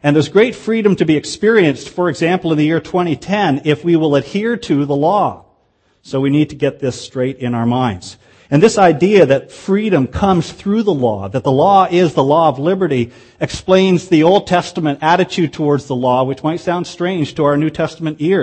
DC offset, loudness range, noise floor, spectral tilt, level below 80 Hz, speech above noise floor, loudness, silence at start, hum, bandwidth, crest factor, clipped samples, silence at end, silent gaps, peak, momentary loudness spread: under 0.1%; 4 LU; -58 dBFS; -6.5 dB/octave; -46 dBFS; 45 dB; -14 LUFS; 0 s; none; 8.8 kHz; 14 dB; under 0.1%; 0 s; none; 0 dBFS; 9 LU